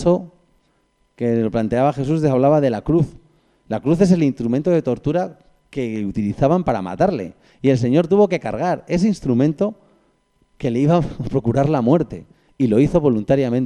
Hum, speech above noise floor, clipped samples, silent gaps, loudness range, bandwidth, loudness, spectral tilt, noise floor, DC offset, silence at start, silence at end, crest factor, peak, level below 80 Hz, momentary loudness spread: none; 45 dB; under 0.1%; none; 2 LU; 10.5 kHz; -19 LUFS; -8.5 dB/octave; -63 dBFS; under 0.1%; 0 s; 0 s; 16 dB; -2 dBFS; -42 dBFS; 9 LU